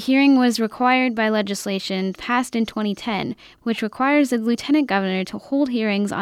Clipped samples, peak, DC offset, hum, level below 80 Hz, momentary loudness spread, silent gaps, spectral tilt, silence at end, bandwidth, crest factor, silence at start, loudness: under 0.1%; -6 dBFS; under 0.1%; none; -60 dBFS; 8 LU; none; -5 dB/octave; 0 s; 15 kHz; 14 dB; 0 s; -21 LUFS